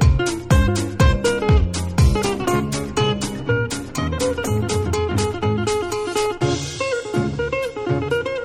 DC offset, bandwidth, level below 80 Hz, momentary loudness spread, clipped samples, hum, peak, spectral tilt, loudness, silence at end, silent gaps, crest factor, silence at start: under 0.1%; 16 kHz; -26 dBFS; 6 LU; under 0.1%; none; -2 dBFS; -5.5 dB/octave; -20 LUFS; 0 s; none; 16 dB; 0 s